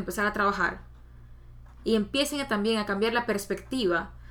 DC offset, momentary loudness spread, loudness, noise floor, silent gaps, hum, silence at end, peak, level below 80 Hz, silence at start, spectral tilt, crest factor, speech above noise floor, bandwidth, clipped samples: under 0.1%; 6 LU; -27 LUFS; -48 dBFS; none; none; 0 s; -12 dBFS; -48 dBFS; 0 s; -4 dB/octave; 16 dB; 21 dB; 19 kHz; under 0.1%